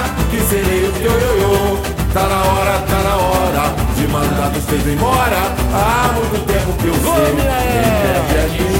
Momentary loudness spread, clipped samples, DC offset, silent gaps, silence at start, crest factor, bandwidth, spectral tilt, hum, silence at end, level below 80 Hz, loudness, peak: 3 LU; under 0.1%; under 0.1%; none; 0 s; 14 dB; 16.5 kHz; -5 dB/octave; none; 0 s; -22 dBFS; -15 LUFS; 0 dBFS